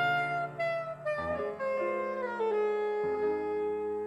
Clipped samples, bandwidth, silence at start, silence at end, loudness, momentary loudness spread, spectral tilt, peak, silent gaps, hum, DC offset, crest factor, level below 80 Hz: under 0.1%; 10.5 kHz; 0 s; 0 s; -32 LUFS; 4 LU; -6 dB/octave; -20 dBFS; none; none; under 0.1%; 12 dB; -64 dBFS